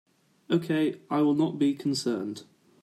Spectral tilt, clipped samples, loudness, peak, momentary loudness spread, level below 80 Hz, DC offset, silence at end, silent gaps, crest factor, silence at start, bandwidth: -6 dB/octave; under 0.1%; -27 LUFS; -12 dBFS; 8 LU; -74 dBFS; under 0.1%; 0.4 s; none; 16 dB; 0.5 s; 13 kHz